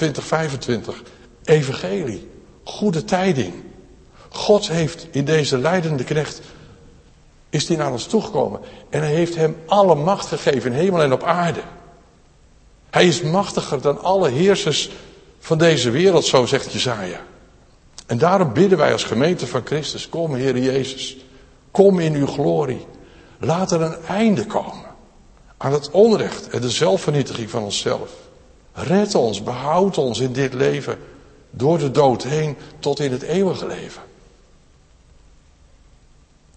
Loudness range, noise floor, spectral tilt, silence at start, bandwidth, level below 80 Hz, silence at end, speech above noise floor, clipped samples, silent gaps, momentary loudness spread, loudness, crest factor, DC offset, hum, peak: 4 LU; -52 dBFS; -5.5 dB/octave; 0 s; 8.8 kHz; -50 dBFS; 2.5 s; 33 dB; under 0.1%; none; 14 LU; -19 LUFS; 20 dB; under 0.1%; none; 0 dBFS